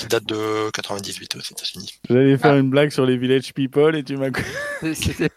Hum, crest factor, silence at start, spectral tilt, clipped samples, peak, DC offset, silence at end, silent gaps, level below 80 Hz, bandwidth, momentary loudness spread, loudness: none; 18 dB; 0 s; -5.5 dB/octave; under 0.1%; -2 dBFS; under 0.1%; 0.05 s; none; -46 dBFS; 15.5 kHz; 13 LU; -20 LUFS